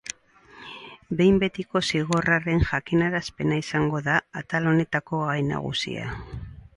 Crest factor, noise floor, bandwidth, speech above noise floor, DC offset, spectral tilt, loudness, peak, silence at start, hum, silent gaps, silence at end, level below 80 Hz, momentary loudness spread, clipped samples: 18 dB; -52 dBFS; 11.5 kHz; 28 dB; under 0.1%; -5.5 dB/octave; -24 LUFS; -6 dBFS; 0.05 s; none; none; 0.15 s; -42 dBFS; 17 LU; under 0.1%